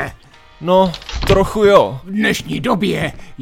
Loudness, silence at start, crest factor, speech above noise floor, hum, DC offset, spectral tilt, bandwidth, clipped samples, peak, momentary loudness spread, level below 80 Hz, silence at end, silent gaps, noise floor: -15 LUFS; 0 s; 16 dB; 27 dB; none; under 0.1%; -5.5 dB/octave; 17 kHz; under 0.1%; 0 dBFS; 12 LU; -32 dBFS; 0 s; none; -42 dBFS